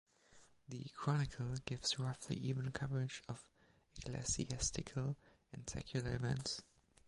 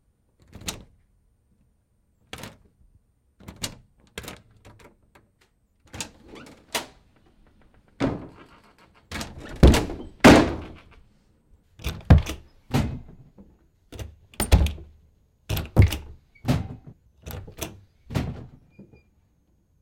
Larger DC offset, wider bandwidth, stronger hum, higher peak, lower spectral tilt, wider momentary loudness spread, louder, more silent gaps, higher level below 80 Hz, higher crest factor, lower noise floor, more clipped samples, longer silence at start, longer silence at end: neither; second, 11.5 kHz vs 16.5 kHz; neither; second, -22 dBFS vs -4 dBFS; about the same, -4.5 dB/octave vs -5.5 dB/octave; second, 13 LU vs 26 LU; second, -42 LUFS vs -23 LUFS; neither; second, -58 dBFS vs -32 dBFS; about the same, 20 dB vs 22 dB; about the same, -67 dBFS vs -67 dBFS; neither; second, 0.3 s vs 0.65 s; second, 0.45 s vs 1.35 s